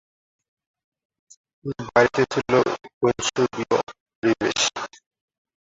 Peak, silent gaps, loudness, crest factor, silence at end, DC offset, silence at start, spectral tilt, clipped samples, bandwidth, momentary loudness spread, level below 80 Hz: -2 dBFS; 2.93-3.01 s, 4.00-4.06 s, 4.15-4.22 s; -22 LUFS; 22 dB; 0.75 s; under 0.1%; 1.65 s; -3.5 dB/octave; under 0.1%; 8 kHz; 15 LU; -58 dBFS